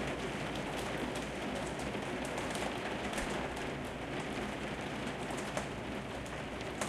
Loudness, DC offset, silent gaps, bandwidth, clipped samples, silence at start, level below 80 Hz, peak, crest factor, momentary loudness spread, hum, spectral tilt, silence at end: -39 LUFS; under 0.1%; none; 15.5 kHz; under 0.1%; 0 s; -54 dBFS; -20 dBFS; 18 dB; 4 LU; none; -4.5 dB/octave; 0 s